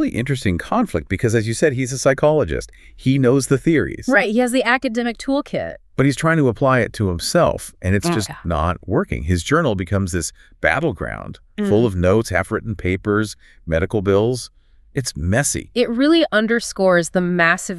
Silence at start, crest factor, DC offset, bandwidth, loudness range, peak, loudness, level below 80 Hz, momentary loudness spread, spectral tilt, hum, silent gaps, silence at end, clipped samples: 0 s; 18 dB; under 0.1%; 13.5 kHz; 3 LU; 0 dBFS; -19 LUFS; -38 dBFS; 9 LU; -5.5 dB/octave; none; none; 0 s; under 0.1%